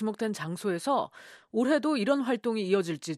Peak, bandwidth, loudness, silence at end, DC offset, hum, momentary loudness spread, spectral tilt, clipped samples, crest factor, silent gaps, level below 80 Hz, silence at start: -14 dBFS; 13.5 kHz; -29 LUFS; 0 s; under 0.1%; none; 7 LU; -5.5 dB/octave; under 0.1%; 16 dB; none; -78 dBFS; 0 s